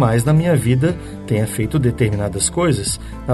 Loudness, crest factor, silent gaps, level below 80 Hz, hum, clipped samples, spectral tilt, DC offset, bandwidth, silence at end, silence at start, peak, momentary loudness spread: -18 LUFS; 14 dB; none; -34 dBFS; none; under 0.1%; -5.5 dB/octave; under 0.1%; 12.5 kHz; 0 s; 0 s; -4 dBFS; 7 LU